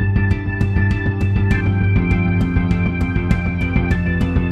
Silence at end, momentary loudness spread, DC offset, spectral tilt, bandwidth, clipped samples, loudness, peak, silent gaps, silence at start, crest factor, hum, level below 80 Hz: 0 s; 2 LU; under 0.1%; -8.5 dB/octave; 6 kHz; under 0.1%; -18 LUFS; -2 dBFS; none; 0 s; 14 dB; none; -24 dBFS